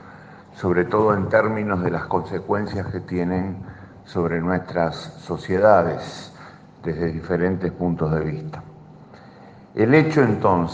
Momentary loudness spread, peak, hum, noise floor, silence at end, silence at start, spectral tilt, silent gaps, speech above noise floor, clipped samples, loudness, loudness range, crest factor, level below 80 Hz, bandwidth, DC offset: 17 LU; -2 dBFS; none; -45 dBFS; 0 s; 0.05 s; -8 dB/octave; none; 24 dB; under 0.1%; -21 LUFS; 4 LU; 20 dB; -52 dBFS; 8 kHz; under 0.1%